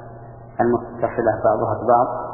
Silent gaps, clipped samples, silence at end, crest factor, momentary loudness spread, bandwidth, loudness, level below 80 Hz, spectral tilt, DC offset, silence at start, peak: none; under 0.1%; 0 s; 16 dB; 17 LU; 2.9 kHz; -20 LUFS; -48 dBFS; -14 dB/octave; under 0.1%; 0 s; -4 dBFS